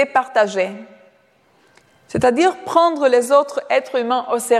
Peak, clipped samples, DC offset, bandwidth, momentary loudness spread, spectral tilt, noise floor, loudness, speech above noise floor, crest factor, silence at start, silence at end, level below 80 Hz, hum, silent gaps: -2 dBFS; under 0.1%; under 0.1%; 14 kHz; 8 LU; -4 dB/octave; -56 dBFS; -17 LUFS; 40 dB; 16 dB; 0 s; 0 s; -56 dBFS; none; none